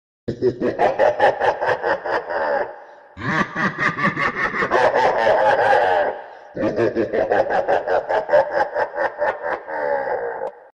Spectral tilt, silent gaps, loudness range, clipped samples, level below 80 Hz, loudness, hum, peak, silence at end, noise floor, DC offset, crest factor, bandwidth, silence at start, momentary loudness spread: -6 dB/octave; none; 3 LU; under 0.1%; -54 dBFS; -20 LUFS; none; -4 dBFS; 0.15 s; -40 dBFS; under 0.1%; 16 dB; 10 kHz; 0.25 s; 9 LU